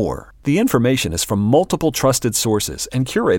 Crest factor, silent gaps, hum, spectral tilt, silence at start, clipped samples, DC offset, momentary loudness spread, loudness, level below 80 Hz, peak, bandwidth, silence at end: 16 dB; none; none; -4.5 dB/octave; 0 s; under 0.1%; under 0.1%; 6 LU; -18 LUFS; -40 dBFS; -2 dBFS; 17 kHz; 0 s